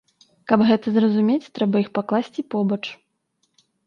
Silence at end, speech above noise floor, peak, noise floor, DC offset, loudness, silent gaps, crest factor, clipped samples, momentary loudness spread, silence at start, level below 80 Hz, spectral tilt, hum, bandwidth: 0.9 s; 51 dB; -2 dBFS; -71 dBFS; under 0.1%; -21 LUFS; none; 20 dB; under 0.1%; 10 LU; 0.5 s; -66 dBFS; -8 dB/octave; none; 6.6 kHz